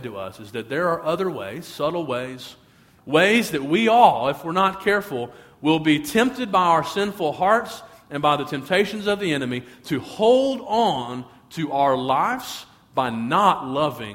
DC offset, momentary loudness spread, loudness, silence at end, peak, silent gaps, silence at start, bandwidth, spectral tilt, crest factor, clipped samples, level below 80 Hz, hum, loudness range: under 0.1%; 15 LU; -21 LUFS; 0 s; -2 dBFS; none; 0 s; 16.5 kHz; -5 dB/octave; 20 dB; under 0.1%; -58 dBFS; none; 4 LU